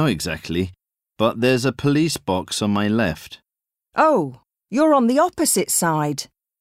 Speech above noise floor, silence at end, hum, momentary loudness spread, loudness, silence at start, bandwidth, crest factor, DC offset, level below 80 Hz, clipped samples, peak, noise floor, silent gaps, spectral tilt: 69 dB; 0.35 s; none; 12 LU; -20 LUFS; 0 s; 16 kHz; 16 dB; under 0.1%; -50 dBFS; under 0.1%; -4 dBFS; -88 dBFS; none; -4.5 dB/octave